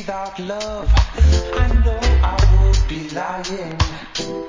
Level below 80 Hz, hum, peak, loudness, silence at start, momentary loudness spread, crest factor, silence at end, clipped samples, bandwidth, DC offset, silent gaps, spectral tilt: -18 dBFS; none; -2 dBFS; -19 LUFS; 0 s; 11 LU; 14 dB; 0 s; under 0.1%; 7.6 kHz; under 0.1%; none; -5.5 dB/octave